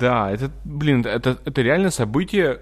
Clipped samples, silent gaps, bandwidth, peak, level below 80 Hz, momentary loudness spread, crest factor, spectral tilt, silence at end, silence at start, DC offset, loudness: under 0.1%; none; 14.5 kHz; -4 dBFS; -40 dBFS; 6 LU; 16 dB; -6 dB/octave; 0 s; 0 s; under 0.1%; -21 LUFS